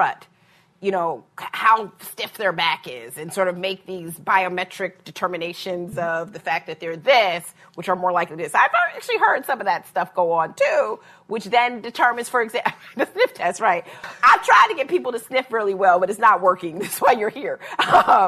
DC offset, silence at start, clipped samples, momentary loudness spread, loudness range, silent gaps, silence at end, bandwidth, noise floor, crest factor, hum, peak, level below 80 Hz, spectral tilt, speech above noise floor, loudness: under 0.1%; 0 s; under 0.1%; 14 LU; 6 LU; none; 0 s; 14 kHz; -57 dBFS; 18 dB; none; -4 dBFS; -66 dBFS; -3.5 dB/octave; 37 dB; -20 LUFS